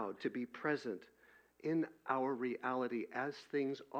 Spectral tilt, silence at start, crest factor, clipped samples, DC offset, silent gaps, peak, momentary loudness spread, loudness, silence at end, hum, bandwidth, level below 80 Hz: -7 dB/octave; 0 s; 20 dB; under 0.1%; under 0.1%; none; -20 dBFS; 4 LU; -40 LUFS; 0 s; none; 16 kHz; -86 dBFS